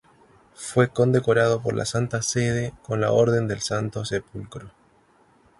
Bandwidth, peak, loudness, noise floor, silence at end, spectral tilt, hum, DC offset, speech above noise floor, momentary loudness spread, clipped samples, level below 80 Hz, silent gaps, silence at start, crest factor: 11.5 kHz; -4 dBFS; -23 LUFS; -59 dBFS; 0.9 s; -5.5 dB/octave; none; under 0.1%; 36 dB; 16 LU; under 0.1%; -52 dBFS; none; 0.6 s; 20 dB